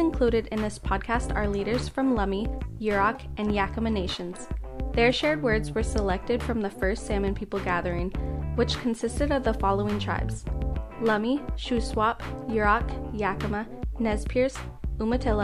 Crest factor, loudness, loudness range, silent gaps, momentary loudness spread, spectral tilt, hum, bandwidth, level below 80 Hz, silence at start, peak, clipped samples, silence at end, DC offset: 18 dB; -27 LUFS; 2 LU; none; 8 LU; -6 dB/octave; none; 12.5 kHz; -34 dBFS; 0 s; -8 dBFS; under 0.1%; 0 s; under 0.1%